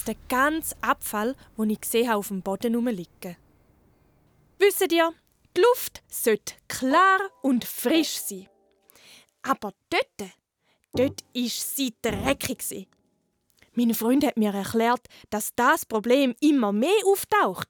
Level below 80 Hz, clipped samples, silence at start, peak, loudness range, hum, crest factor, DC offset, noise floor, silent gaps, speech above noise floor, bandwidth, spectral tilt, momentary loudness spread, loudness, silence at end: -56 dBFS; under 0.1%; 0 s; -6 dBFS; 6 LU; none; 18 dB; under 0.1%; -71 dBFS; none; 47 dB; over 20 kHz; -3.5 dB/octave; 12 LU; -24 LUFS; 0.05 s